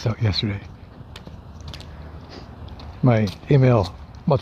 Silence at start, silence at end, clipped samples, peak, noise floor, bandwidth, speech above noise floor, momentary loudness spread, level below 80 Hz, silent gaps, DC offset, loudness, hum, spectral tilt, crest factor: 0 s; 0 s; under 0.1%; -4 dBFS; -40 dBFS; 7.2 kHz; 21 dB; 22 LU; -44 dBFS; none; under 0.1%; -21 LUFS; none; -8 dB/octave; 18 dB